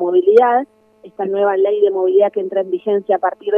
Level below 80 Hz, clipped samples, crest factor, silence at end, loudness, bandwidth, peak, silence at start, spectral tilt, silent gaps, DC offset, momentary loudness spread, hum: -72 dBFS; under 0.1%; 14 dB; 0 s; -15 LUFS; 4.5 kHz; 0 dBFS; 0 s; -7.5 dB/octave; none; under 0.1%; 9 LU; none